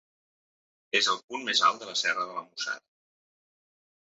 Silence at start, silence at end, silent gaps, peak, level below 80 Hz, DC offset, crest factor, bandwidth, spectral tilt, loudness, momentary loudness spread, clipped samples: 0.95 s; 1.35 s; 1.24-1.28 s; -10 dBFS; -86 dBFS; under 0.1%; 22 dB; 7.6 kHz; 2.5 dB/octave; -27 LUFS; 11 LU; under 0.1%